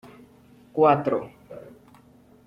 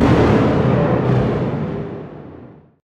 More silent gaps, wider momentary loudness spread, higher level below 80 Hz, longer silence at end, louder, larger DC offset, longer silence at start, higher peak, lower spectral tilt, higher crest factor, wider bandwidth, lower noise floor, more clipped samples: neither; first, 24 LU vs 21 LU; second, -64 dBFS vs -32 dBFS; first, 0.85 s vs 0.35 s; second, -22 LUFS vs -17 LUFS; neither; first, 0.75 s vs 0 s; second, -6 dBFS vs -2 dBFS; about the same, -8.5 dB/octave vs -8.5 dB/octave; first, 22 dB vs 14 dB; second, 5.8 kHz vs 8.4 kHz; first, -54 dBFS vs -40 dBFS; neither